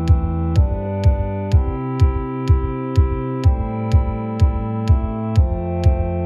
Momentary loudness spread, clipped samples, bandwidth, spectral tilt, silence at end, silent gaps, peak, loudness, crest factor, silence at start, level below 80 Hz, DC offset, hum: 3 LU; under 0.1%; 7.2 kHz; -9 dB/octave; 0 s; none; -2 dBFS; -19 LUFS; 14 dB; 0 s; -20 dBFS; under 0.1%; none